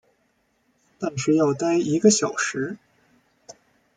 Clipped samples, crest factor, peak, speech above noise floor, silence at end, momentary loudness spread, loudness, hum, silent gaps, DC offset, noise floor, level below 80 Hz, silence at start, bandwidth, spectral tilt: under 0.1%; 22 dB; -4 dBFS; 47 dB; 0.45 s; 14 LU; -22 LUFS; none; none; under 0.1%; -68 dBFS; -68 dBFS; 1 s; 9.6 kHz; -4.5 dB/octave